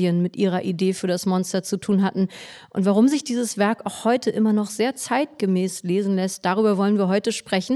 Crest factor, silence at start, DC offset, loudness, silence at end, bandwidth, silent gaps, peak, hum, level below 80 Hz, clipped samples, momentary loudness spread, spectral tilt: 14 dB; 0 s; under 0.1%; -22 LUFS; 0 s; 13 kHz; none; -8 dBFS; none; -68 dBFS; under 0.1%; 5 LU; -5.5 dB/octave